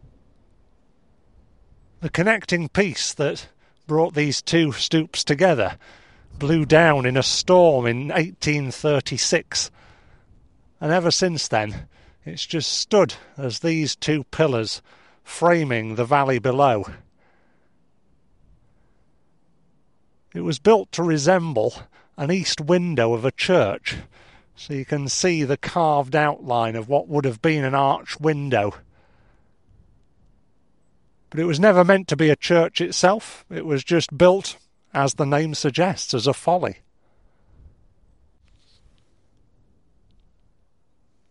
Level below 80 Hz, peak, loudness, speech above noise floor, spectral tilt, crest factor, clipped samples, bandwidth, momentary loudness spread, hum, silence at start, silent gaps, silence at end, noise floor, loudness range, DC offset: -54 dBFS; -2 dBFS; -20 LUFS; 47 dB; -4.5 dB/octave; 20 dB; under 0.1%; 11.5 kHz; 13 LU; none; 2 s; none; 4.55 s; -68 dBFS; 7 LU; 0.1%